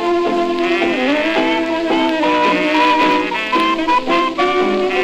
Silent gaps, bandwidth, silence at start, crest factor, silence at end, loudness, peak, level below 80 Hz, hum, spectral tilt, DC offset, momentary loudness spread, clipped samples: none; 12 kHz; 0 s; 14 dB; 0 s; -15 LUFS; 0 dBFS; -48 dBFS; none; -4 dB/octave; under 0.1%; 4 LU; under 0.1%